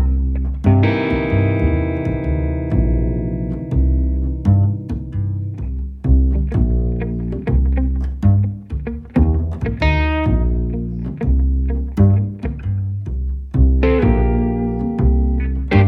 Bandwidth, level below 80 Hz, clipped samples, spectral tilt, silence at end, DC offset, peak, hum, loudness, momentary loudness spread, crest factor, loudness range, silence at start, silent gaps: 4.6 kHz; -20 dBFS; under 0.1%; -10 dB/octave; 0 s; under 0.1%; -2 dBFS; none; -18 LUFS; 9 LU; 14 dB; 2 LU; 0 s; none